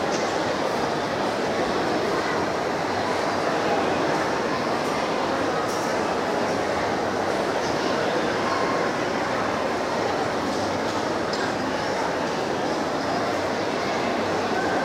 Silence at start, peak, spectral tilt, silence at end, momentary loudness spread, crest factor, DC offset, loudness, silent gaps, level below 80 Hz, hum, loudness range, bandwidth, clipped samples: 0 s; -10 dBFS; -4.5 dB/octave; 0 s; 2 LU; 14 dB; under 0.1%; -24 LUFS; none; -54 dBFS; none; 1 LU; 16 kHz; under 0.1%